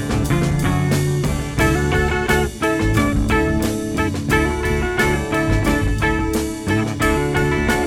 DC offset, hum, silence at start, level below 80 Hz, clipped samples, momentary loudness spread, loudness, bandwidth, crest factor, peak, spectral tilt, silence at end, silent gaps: under 0.1%; none; 0 s; -26 dBFS; under 0.1%; 3 LU; -19 LUFS; 17 kHz; 16 dB; -2 dBFS; -5.5 dB/octave; 0 s; none